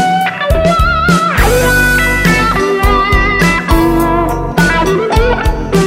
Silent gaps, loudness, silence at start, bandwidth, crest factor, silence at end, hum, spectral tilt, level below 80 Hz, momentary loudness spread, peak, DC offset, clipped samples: none; -10 LUFS; 0 s; 16.5 kHz; 10 dB; 0 s; none; -5 dB/octave; -18 dBFS; 4 LU; 0 dBFS; under 0.1%; 0.1%